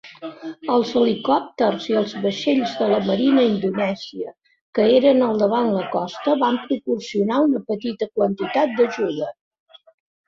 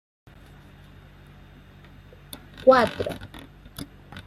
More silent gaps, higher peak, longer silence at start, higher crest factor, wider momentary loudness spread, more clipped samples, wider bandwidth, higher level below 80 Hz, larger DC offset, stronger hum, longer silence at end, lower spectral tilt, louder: first, 4.61-4.73 s vs none; about the same, -4 dBFS vs -4 dBFS; second, 0.05 s vs 2.6 s; second, 16 dB vs 24 dB; second, 12 LU vs 25 LU; neither; second, 7.6 kHz vs 14 kHz; second, -64 dBFS vs -52 dBFS; neither; neither; first, 0.95 s vs 0.05 s; about the same, -6.5 dB/octave vs -5.5 dB/octave; about the same, -20 LUFS vs -21 LUFS